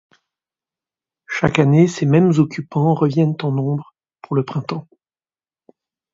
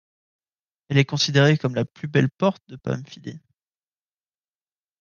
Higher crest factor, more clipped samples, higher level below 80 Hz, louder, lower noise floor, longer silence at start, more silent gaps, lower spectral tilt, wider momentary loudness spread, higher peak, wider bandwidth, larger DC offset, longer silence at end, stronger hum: about the same, 18 dB vs 20 dB; neither; first, -54 dBFS vs -64 dBFS; first, -18 LUFS vs -22 LUFS; about the same, under -90 dBFS vs under -90 dBFS; first, 1.3 s vs 0.9 s; neither; first, -7.5 dB/octave vs -5.5 dB/octave; second, 12 LU vs 18 LU; first, 0 dBFS vs -4 dBFS; about the same, 7.6 kHz vs 7.2 kHz; neither; second, 1.3 s vs 1.65 s; neither